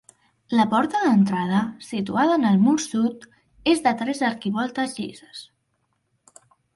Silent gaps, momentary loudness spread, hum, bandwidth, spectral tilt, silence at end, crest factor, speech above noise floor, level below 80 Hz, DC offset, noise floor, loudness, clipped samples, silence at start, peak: none; 12 LU; none; 11.5 kHz; -5.5 dB/octave; 1.3 s; 16 dB; 50 dB; -64 dBFS; under 0.1%; -72 dBFS; -22 LUFS; under 0.1%; 0.5 s; -6 dBFS